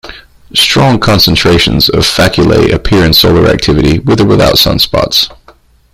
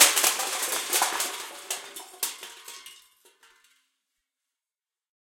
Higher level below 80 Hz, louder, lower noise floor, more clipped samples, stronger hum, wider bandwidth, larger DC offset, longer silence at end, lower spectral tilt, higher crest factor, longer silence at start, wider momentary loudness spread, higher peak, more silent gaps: first, -24 dBFS vs -84 dBFS; first, -7 LUFS vs -26 LUFS; second, -42 dBFS vs under -90 dBFS; first, 0.4% vs under 0.1%; neither; first, over 20 kHz vs 17 kHz; neither; second, 0.6 s vs 2.3 s; first, -5 dB/octave vs 2.5 dB/octave; second, 8 dB vs 30 dB; about the same, 0.05 s vs 0 s; second, 4 LU vs 19 LU; about the same, 0 dBFS vs 0 dBFS; neither